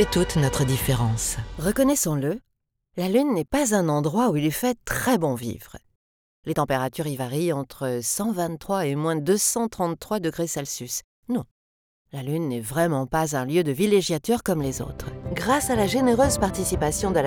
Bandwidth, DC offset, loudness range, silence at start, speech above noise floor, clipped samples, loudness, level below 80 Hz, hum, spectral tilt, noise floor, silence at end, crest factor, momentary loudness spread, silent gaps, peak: over 20 kHz; under 0.1%; 4 LU; 0 s; 44 dB; under 0.1%; -24 LUFS; -42 dBFS; none; -5 dB/octave; -68 dBFS; 0 s; 18 dB; 9 LU; 5.96-6.43 s, 11.04-11.23 s, 11.51-12.05 s; -6 dBFS